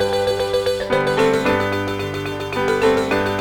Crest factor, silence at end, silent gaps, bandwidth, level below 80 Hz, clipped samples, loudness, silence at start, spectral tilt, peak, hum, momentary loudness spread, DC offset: 14 dB; 0 s; none; over 20 kHz; -44 dBFS; under 0.1%; -19 LUFS; 0 s; -5 dB/octave; -4 dBFS; 50 Hz at -45 dBFS; 7 LU; under 0.1%